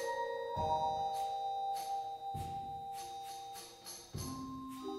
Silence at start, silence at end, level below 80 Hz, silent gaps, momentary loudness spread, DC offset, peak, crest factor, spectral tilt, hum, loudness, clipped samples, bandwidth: 0 s; 0 s; -62 dBFS; none; 11 LU; under 0.1%; -24 dBFS; 16 dB; -4 dB/octave; none; -41 LUFS; under 0.1%; 16 kHz